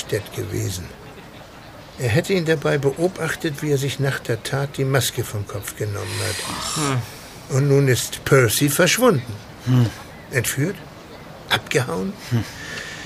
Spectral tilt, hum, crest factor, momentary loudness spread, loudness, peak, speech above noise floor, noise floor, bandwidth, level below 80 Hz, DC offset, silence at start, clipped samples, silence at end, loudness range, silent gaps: -4.5 dB/octave; none; 20 dB; 21 LU; -21 LUFS; -2 dBFS; 20 dB; -40 dBFS; 15.5 kHz; -48 dBFS; under 0.1%; 0 s; under 0.1%; 0 s; 5 LU; none